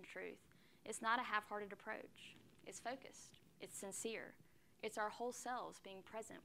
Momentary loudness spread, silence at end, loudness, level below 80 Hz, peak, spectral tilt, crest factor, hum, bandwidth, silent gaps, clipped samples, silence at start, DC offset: 19 LU; 0 s; -47 LUFS; -84 dBFS; -24 dBFS; -2 dB/octave; 24 dB; none; 16 kHz; none; under 0.1%; 0 s; under 0.1%